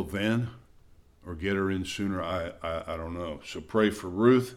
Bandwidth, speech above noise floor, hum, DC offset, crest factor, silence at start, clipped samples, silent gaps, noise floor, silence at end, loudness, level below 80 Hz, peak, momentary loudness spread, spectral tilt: 15 kHz; 28 dB; none; under 0.1%; 20 dB; 0 s; under 0.1%; none; -56 dBFS; 0 s; -30 LUFS; -52 dBFS; -8 dBFS; 12 LU; -6 dB/octave